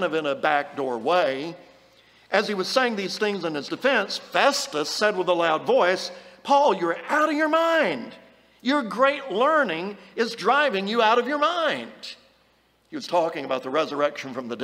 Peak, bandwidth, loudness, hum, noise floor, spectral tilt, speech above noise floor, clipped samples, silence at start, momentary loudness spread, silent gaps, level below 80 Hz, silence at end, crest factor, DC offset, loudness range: -4 dBFS; 16 kHz; -23 LUFS; none; -63 dBFS; -3.5 dB/octave; 39 dB; under 0.1%; 0 s; 12 LU; none; -74 dBFS; 0 s; 20 dB; under 0.1%; 3 LU